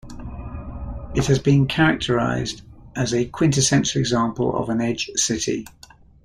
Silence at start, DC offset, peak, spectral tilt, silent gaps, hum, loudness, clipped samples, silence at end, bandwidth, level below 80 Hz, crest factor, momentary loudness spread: 0.05 s; under 0.1%; -4 dBFS; -4.5 dB/octave; none; none; -21 LUFS; under 0.1%; 0.55 s; 13.5 kHz; -40 dBFS; 18 dB; 17 LU